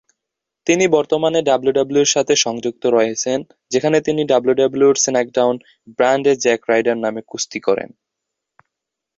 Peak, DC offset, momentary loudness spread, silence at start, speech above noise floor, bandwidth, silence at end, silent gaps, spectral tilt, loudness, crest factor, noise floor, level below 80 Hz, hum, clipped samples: -2 dBFS; under 0.1%; 9 LU; 0.65 s; 65 dB; 7.8 kHz; 1.3 s; none; -3 dB/octave; -17 LUFS; 16 dB; -82 dBFS; -60 dBFS; none; under 0.1%